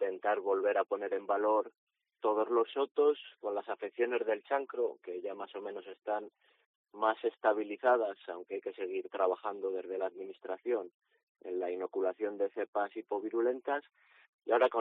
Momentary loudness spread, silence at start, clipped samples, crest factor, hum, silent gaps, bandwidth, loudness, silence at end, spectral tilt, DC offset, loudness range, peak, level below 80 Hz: 12 LU; 0 s; under 0.1%; 20 dB; none; 1.78-1.87 s, 2.91-2.95 s, 6.66-6.84 s, 10.94-11.00 s, 11.23-11.35 s, 12.68-12.73 s, 14.29-14.39 s; 4.1 kHz; -34 LUFS; 0 s; -1.5 dB/octave; under 0.1%; 5 LU; -16 dBFS; under -90 dBFS